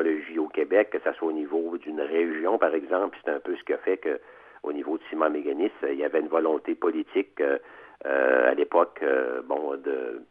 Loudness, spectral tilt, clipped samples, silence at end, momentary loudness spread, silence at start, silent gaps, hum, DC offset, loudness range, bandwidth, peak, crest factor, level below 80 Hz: -27 LUFS; -7 dB/octave; under 0.1%; 0.05 s; 9 LU; 0 s; none; none; under 0.1%; 3 LU; 4 kHz; -6 dBFS; 20 dB; -76 dBFS